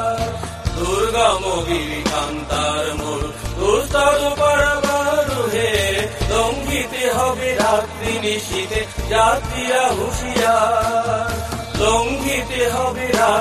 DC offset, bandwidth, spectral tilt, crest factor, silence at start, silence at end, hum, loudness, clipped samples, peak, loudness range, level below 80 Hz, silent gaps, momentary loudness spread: under 0.1%; 15.5 kHz; -3.5 dB/octave; 16 dB; 0 s; 0 s; none; -18 LUFS; under 0.1%; -2 dBFS; 2 LU; -32 dBFS; none; 7 LU